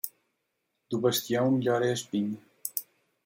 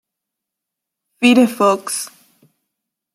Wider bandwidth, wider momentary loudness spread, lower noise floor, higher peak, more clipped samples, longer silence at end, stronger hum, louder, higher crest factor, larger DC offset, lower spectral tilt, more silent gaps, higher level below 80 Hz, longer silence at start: about the same, 16.5 kHz vs 15.5 kHz; about the same, 10 LU vs 12 LU; about the same, -80 dBFS vs -82 dBFS; second, -12 dBFS vs -2 dBFS; neither; second, 0.45 s vs 1.1 s; neither; second, -29 LUFS vs -15 LUFS; about the same, 18 dB vs 18 dB; neither; first, -5 dB/octave vs -3.5 dB/octave; neither; second, -72 dBFS vs -66 dBFS; second, 0.05 s vs 1.2 s